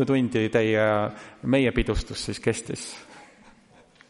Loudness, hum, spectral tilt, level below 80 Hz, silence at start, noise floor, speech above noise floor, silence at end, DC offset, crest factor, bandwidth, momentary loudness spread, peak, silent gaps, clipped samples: -25 LUFS; none; -5.5 dB/octave; -40 dBFS; 0 s; -55 dBFS; 31 dB; 0.85 s; under 0.1%; 18 dB; 11.5 kHz; 13 LU; -8 dBFS; none; under 0.1%